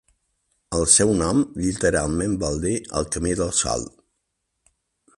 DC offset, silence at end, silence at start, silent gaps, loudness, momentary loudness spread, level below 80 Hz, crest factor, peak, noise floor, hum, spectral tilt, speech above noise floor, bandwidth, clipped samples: under 0.1%; 1.3 s; 0.7 s; none; -21 LUFS; 10 LU; -40 dBFS; 22 dB; -2 dBFS; -76 dBFS; none; -4 dB/octave; 55 dB; 11.5 kHz; under 0.1%